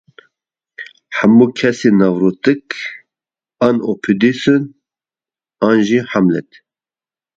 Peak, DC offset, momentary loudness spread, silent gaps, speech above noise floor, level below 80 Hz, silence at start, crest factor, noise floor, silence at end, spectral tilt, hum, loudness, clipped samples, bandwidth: 0 dBFS; under 0.1%; 14 LU; none; over 77 dB; -56 dBFS; 0.8 s; 16 dB; under -90 dBFS; 0.95 s; -6.5 dB/octave; none; -14 LUFS; under 0.1%; 7.6 kHz